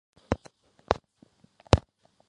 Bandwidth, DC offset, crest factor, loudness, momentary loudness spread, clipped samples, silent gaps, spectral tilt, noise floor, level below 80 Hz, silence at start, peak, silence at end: 10.5 kHz; under 0.1%; 30 dB; -29 LUFS; 9 LU; under 0.1%; none; -6 dB/octave; -61 dBFS; -40 dBFS; 0.3 s; 0 dBFS; 0.5 s